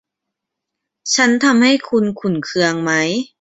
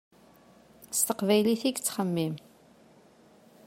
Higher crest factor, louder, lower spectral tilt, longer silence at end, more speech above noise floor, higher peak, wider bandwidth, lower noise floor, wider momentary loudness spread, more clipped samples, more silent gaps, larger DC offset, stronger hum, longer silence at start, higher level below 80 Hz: about the same, 16 dB vs 20 dB; first, -15 LUFS vs -28 LUFS; about the same, -3.5 dB/octave vs -4 dB/octave; second, 0.15 s vs 1.25 s; first, 65 dB vs 31 dB; first, -2 dBFS vs -12 dBFS; second, 8 kHz vs 16 kHz; first, -80 dBFS vs -58 dBFS; about the same, 8 LU vs 9 LU; neither; neither; neither; neither; first, 1.05 s vs 0.8 s; first, -60 dBFS vs -74 dBFS